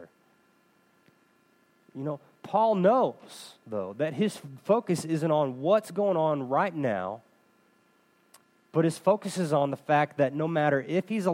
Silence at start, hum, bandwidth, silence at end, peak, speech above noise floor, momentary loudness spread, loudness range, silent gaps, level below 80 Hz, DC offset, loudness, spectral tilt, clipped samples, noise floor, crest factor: 0 s; none; 16 kHz; 0 s; -10 dBFS; 39 dB; 13 LU; 3 LU; none; -80 dBFS; under 0.1%; -27 LUFS; -6.5 dB/octave; under 0.1%; -65 dBFS; 20 dB